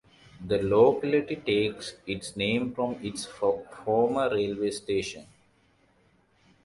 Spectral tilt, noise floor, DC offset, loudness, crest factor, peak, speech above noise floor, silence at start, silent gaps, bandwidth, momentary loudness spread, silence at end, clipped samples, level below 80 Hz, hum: -5 dB/octave; -65 dBFS; under 0.1%; -27 LUFS; 20 dB; -8 dBFS; 38 dB; 0.4 s; none; 11.5 kHz; 14 LU; 1.4 s; under 0.1%; -58 dBFS; none